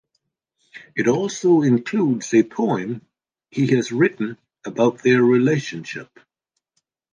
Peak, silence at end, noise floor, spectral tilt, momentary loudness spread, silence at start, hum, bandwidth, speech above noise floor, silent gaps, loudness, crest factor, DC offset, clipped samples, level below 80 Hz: -4 dBFS; 1.1 s; -74 dBFS; -6.5 dB/octave; 16 LU; 0.75 s; none; 9.6 kHz; 55 dB; none; -19 LUFS; 16 dB; under 0.1%; under 0.1%; -68 dBFS